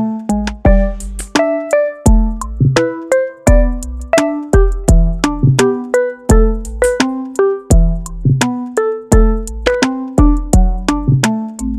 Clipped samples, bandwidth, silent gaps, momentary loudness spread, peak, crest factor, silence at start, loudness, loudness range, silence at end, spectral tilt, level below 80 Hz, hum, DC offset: under 0.1%; 13 kHz; none; 5 LU; 0 dBFS; 12 dB; 0 s; -14 LUFS; 1 LU; 0 s; -6 dB/octave; -16 dBFS; none; under 0.1%